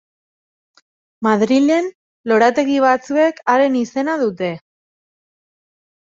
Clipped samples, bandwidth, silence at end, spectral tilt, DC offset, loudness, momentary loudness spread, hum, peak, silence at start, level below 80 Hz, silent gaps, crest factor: under 0.1%; 7.6 kHz; 1.45 s; -5.5 dB/octave; under 0.1%; -16 LUFS; 11 LU; none; 0 dBFS; 1.2 s; -64 dBFS; 1.95-2.24 s; 18 dB